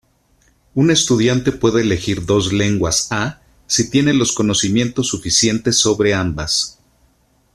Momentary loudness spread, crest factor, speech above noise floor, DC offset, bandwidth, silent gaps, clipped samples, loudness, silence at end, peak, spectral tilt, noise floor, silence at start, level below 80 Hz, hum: 6 LU; 16 dB; 41 dB; under 0.1%; 13.5 kHz; none; under 0.1%; -16 LUFS; 0.85 s; -2 dBFS; -4 dB/octave; -57 dBFS; 0.75 s; -42 dBFS; none